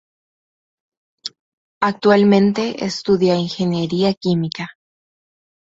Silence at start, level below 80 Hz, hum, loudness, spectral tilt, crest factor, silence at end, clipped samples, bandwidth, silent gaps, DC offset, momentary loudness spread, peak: 1.25 s; -58 dBFS; none; -17 LUFS; -6.5 dB/octave; 18 dB; 1.05 s; under 0.1%; 7.8 kHz; 1.39-1.81 s, 4.17-4.21 s; under 0.1%; 19 LU; -2 dBFS